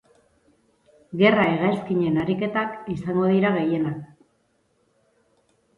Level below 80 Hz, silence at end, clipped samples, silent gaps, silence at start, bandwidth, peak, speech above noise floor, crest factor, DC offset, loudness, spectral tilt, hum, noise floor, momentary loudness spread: -58 dBFS; 1.7 s; under 0.1%; none; 1.1 s; 5.6 kHz; -4 dBFS; 45 dB; 20 dB; under 0.1%; -22 LUFS; -8.5 dB/octave; none; -67 dBFS; 11 LU